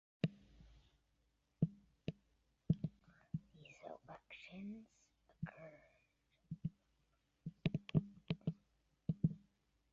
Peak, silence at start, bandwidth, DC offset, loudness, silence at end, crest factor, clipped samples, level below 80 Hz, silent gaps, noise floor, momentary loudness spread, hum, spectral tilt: -22 dBFS; 0.25 s; 7 kHz; under 0.1%; -45 LUFS; 0.55 s; 24 dB; under 0.1%; -68 dBFS; none; -81 dBFS; 16 LU; none; -8 dB/octave